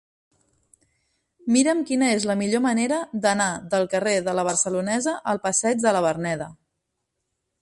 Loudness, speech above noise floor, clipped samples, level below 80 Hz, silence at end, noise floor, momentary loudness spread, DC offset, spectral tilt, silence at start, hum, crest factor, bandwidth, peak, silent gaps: -22 LUFS; 56 dB; under 0.1%; -64 dBFS; 1.1 s; -78 dBFS; 5 LU; under 0.1%; -3.5 dB/octave; 1.45 s; none; 18 dB; 11.5 kHz; -6 dBFS; none